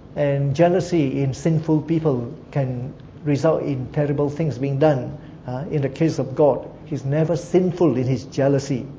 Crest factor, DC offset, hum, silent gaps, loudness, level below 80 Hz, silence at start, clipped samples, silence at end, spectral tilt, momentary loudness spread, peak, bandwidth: 16 dB; under 0.1%; none; none; -21 LUFS; -48 dBFS; 0 s; under 0.1%; 0 s; -8 dB/octave; 10 LU; -4 dBFS; 8 kHz